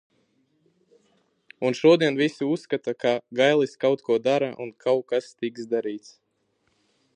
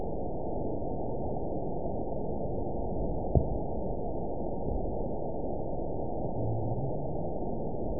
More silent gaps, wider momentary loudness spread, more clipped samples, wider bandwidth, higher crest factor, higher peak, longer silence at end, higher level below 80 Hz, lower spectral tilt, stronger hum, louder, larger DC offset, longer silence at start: neither; first, 11 LU vs 4 LU; neither; first, 9.6 kHz vs 1 kHz; about the same, 20 dB vs 24 dB; first, -6 dBFS vs -10 dBFS; first, 1.15 s vs 0 s; second, -78 dBFS vs -40 dBFS; second, -5.5 dB/octave vs -16.5 dB/octave; neither; first, -24 LUFS vs -35 LUFS; second, under 0.1% vs 2%; first, 1.6 s vs 0 s